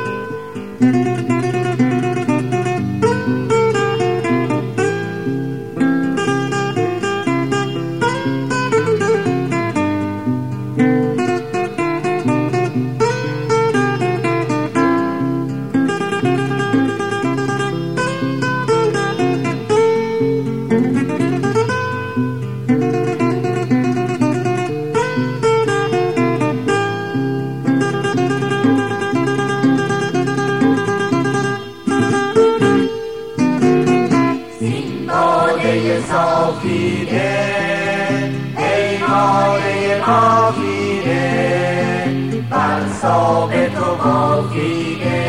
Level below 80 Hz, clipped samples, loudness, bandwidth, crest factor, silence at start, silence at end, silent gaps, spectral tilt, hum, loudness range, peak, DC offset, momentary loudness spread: -52 dBFS; under 0.1%; -17 LUFS; 11.5 kHz; 14 dB; 0 s; 0 s; none; -6.5 dB/octave; none; 3 LU; -2 dBFS; 0.6%; 6 LU